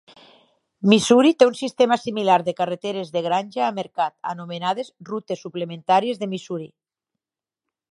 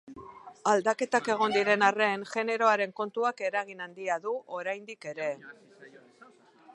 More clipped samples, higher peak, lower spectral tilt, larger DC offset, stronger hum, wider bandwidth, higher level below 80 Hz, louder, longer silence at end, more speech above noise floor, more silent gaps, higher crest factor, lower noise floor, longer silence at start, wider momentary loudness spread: neither; first, 0 dBFS vs -8 dBFS; first, -5 dB/octave vs -3.5 dB/octave; neither; neither; about the same, 11.5 kHz vs 11.5 kHz; first, -68 dBFS vs -76 dBFS; first, -21 LUFS vs -29 LUFS; first, 1.25 s vs 0.5 s; first, 69 dB vs 28 dB; neither; about the same, 22 dB vs 22 dB; first, -90 dBFS vs -57 dBFS; first, 0.8 s vs 0.05 s; about the same, 15 LU vs 15 LU